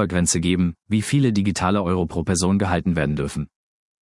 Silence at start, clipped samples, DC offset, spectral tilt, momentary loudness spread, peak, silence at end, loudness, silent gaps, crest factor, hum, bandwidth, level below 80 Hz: 0 s; under 0.1%; under 0.1%; -5.5 dB/octave; 6 LU; -4 dBFS; 0.55 s; -21 LUFS; none; 16 dB; none; 12 kHz; -44 dBFS